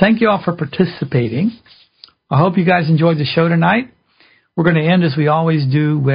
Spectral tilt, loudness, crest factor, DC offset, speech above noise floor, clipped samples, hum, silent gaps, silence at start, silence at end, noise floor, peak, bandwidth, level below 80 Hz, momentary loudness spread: -11.5 dB/octave; -15 LUFS; 14 dB; under 0.1%; 39 dB; under 0.1%; none; none; 0 s; 0 s; -53 dBFS; 0 dBFS; 5.2 kHz; -52 dBFS; 6 LU